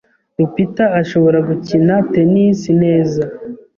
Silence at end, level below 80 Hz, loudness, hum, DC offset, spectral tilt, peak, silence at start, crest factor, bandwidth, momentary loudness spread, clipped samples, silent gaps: 0.2 s; -50 dBFS; -14 LUFS; none; under 0.1%; -8.5 dB/octave; -2 dBFS; 0.4 s; 12 dB; 7.2 kHz; 8 LU; under 0.1%; none